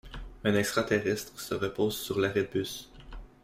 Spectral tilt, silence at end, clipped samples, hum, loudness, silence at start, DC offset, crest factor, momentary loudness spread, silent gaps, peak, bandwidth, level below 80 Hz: -4.5 dB/octave; 0.15 s; under 0.1%; none; -30 LUFS; 0.05 s; under 0.1%; 18 dB; 19 LU; none; -12 dBFS; 16 kHz; -50 dBFS